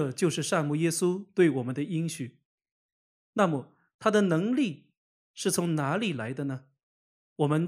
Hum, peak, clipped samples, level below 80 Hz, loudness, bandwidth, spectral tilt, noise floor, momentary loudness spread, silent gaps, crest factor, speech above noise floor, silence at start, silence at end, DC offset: none; -8 dBFS; under 0.1%; -76 dBFS; -28 LUFS; 15.5 kHz; -5.5 dB/octave; under -90 dBFS; 11 LU; 2.45-2.58 s, 2.71-3.33 s, 3.94-3.99 s, 4.97-5.34 s, 6.83-7.36 s; 20 dB; over 63 dB; 0 s; 0 s; under 0.1%